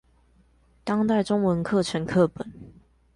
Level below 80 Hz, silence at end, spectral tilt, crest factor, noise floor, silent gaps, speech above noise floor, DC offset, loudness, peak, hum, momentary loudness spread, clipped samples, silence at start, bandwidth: -54 dBFS; 0.45 s; -6.5 dB/octave; 16 dB; -60 dBFS; none; 37 dB; under 0.1%; -24 LUFS; -10 dBFS; none; 15 LU; under 0.1%; 0.85 s; 11.5 kHz